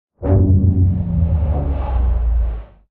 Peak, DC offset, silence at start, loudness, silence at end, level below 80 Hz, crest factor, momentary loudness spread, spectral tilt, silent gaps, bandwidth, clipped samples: -2 dBFS; under 0.1%; 0.2 s; -18 LUFS; 0.25 s; -20 dBFS; 14 dB; 7 LU; -14 dB/octave; none; 3 kHz; under 0.1%